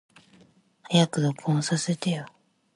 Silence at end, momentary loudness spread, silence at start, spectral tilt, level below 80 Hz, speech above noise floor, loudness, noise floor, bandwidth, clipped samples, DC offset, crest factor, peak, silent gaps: 0.45 s; 9 LU; 0.9 s; -5 dB/octave; -70 dBFS; 34 dB; -26 LUFS; -59 dBFS; 11.5 kHz; under 0.1%; under 0.1%; 18 dB; -10 dBFS; none